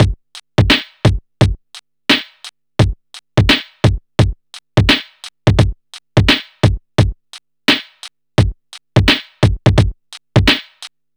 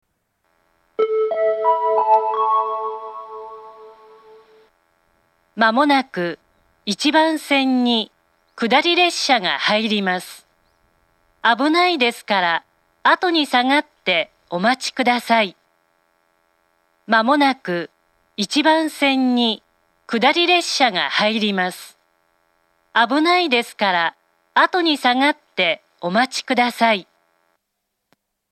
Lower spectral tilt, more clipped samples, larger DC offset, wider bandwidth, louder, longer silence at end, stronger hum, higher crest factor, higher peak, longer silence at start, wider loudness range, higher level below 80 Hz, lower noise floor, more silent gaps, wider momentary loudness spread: first, -5.5 dB/octave vs -3.5 dB/octave; neither; neither; first, over 20 kHz vs 14 kHz; first, -15 LUFS vs -18 LUFS; second, 0.3 s vs 1.5 s; neither; about the same, 16 dB vs 20 dB; about the same, 0 dBFS vs 0 dBFS; second, 0 s vs 1 s; second, 1 LU vs 4 LU; first, -26 dBFS vs -74 dBFS; second, -42 dBFS vs -76 dBFS; neither; first, 20 LU vs 11 LU